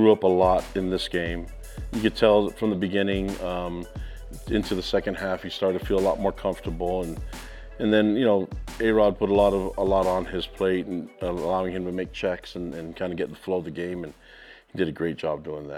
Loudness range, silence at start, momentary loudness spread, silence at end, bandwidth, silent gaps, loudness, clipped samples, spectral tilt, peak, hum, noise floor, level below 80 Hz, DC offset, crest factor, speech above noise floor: 7 LU; 0 s; 14 LU; 0 s; 16.5 kHz; none; -25 LUFS; under 0.1%; -6.5 dB/octave; -4 dBFS; none; -49 dBFS; -40 dBFS; under 0.1%; 20 dB; 24 dB